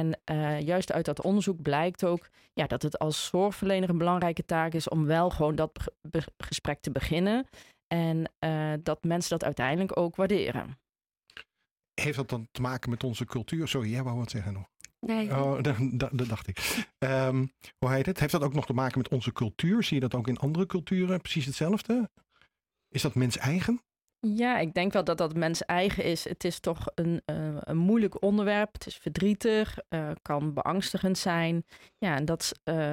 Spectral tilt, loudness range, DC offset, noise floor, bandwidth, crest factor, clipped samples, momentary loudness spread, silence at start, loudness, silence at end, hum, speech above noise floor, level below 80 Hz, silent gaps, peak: -6 dB/octave; 3 LU; under 0.1%; -84 dBFS; 16.5 kHz; 16 dB; under 0.1%; 8 LU; 0 s; -30 LUFS; 0 s; none; 55 dB; -52 dBFS; 7.83-7.91 s; -14 dBFS